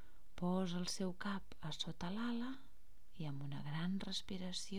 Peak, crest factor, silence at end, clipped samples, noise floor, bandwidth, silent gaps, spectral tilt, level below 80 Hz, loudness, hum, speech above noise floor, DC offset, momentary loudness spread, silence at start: -26 dBFS; 16 dB; 0 s; under 0.1%; -66 dBFS; 15 kHz; none; -5 dB/octave; -64 dBFS; -44 LUFS; none; 22 dB; 0.6%; 9 LU; 0 s